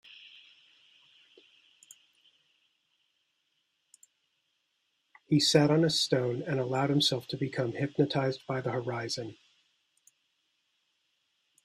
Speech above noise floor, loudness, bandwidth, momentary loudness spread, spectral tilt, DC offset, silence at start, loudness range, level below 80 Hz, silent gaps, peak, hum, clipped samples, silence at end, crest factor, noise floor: 49 dB; -29 LUFS; 14.5 kHz; 12 LU; -5 dB/octave; under 0.1%; 0.2 s; 9 LU; -72 dBFS; none; -10 dBFS; none; under 0.1%; 2.3 s; 24 dB; -78 dBFS